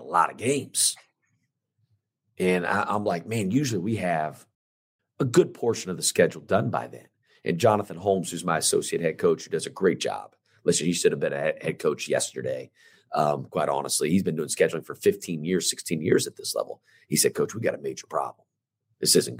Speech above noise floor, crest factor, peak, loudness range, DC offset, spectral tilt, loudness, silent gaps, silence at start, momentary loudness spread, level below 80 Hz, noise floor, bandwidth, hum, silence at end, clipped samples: 51 dB; 20 dB; -6 dBFS; 2 LU; under 0.1%; -4 dB/octave; -25 LUFS; 4.55-4.99 s; 0 s; 9 LU; -72 dBFS; -77 dBFS; 16 kHz; none; 0 s; under 0.1%